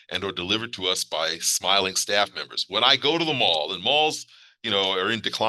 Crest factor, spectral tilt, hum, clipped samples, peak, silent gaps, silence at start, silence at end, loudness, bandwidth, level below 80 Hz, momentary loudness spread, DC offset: 22 dB; -1.5 dB/octave; none; under 0.1%; -2 dBFS; none; 0.1 s; 0 s; -22 LUFS; 13 kHz; -70 dBFS; 7 LU; under 0.1%